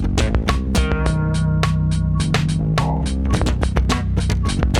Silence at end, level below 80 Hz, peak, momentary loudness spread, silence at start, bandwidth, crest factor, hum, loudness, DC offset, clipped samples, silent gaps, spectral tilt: 0 s; -22 dBFS; -2 dBFS; 2 LU; 0 s; 12 kHz; 16 dB; none; -19 LUFS; under 0.1%; under 0.1%; none; -6 dB/octave